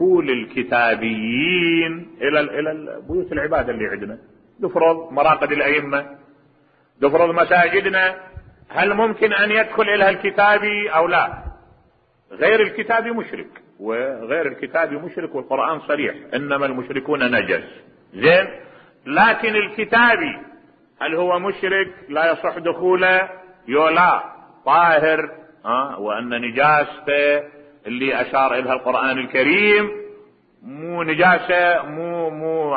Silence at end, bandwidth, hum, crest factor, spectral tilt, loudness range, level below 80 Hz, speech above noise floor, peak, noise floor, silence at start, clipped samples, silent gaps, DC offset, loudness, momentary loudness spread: 0 s; 5 kHz; none; 16 dB; -9.5 dB/octave; 5 LU; -52 dBFS; 40 dB; -2 dBFS; -58 dBFS; 0 s; under 0.1%; none; under 0.1%; -18 LUFS; 13 LU